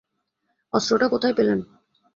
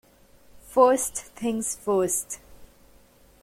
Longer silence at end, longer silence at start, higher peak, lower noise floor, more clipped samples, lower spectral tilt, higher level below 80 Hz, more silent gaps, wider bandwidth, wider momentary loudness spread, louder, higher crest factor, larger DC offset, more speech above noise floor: second, 0.5 s vs 0.8 s; first, 0.75 s vs 0.55 s; about the same, -4 dBFS vs -6 dBFS; first, -75 dBFS vs -56 dBFS; neither; about the same, -4.5 dB/octave vs -4 dB/octave; about the same, -62 dBFS vs -58 dBFS; neither; second, 7.6 kHz vs 16.5 kHz; second, 6 LU vs 12 LU; about the same, -22 LUFS vs -24 LUFS; about the same, 20 dB vs 22 dB; neither; first, 54 dB vs 32 dB